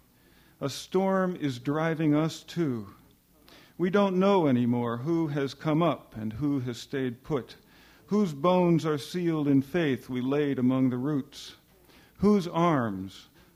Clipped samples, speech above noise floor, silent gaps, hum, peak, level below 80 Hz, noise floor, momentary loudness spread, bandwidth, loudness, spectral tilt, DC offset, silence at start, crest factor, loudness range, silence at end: under 0.1%; 33 dB; none; none; -12 dBFS; -62 dBFS; -60 dBFS; 11 LU; 16 kHz; -28 LUFS; -7 dB/octave; under 0.1%; 0.6 s; 16 dB; 3 LU; 0.35 s